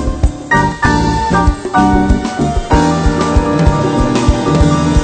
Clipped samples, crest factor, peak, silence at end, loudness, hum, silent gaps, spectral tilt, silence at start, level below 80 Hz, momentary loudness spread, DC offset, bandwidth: under 0.1%; 12 dB; 0 dBFS; 0 s; -12 LUFS; none; none; -6.5 dB/octave; 0 s; -18 dBFS; 3 LU; under 0.1%; 9.2 kHz